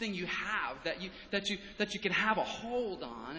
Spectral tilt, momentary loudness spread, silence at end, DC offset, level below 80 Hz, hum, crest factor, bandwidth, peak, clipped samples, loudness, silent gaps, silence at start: -4 dB/octave; 8 LU; 0 s; under 0.1%; -62 dBFS; none; 20 dB; 8 kHz; -16 dBFS; under 0.1%; -35 LUFS; none; 0 s